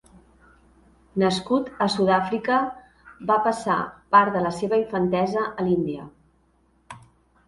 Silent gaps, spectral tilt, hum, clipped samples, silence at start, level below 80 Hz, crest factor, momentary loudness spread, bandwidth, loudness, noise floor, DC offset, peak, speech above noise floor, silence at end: none; -6 dB/octave; none; under 0.1%; 1.15 s; -58 dBFS; 20 dB; 12 LU; 11.5 kHz; -23 LUFS; -63 dBFS; under 0.1%; -4 dBFS; 41 dB; 0.5 s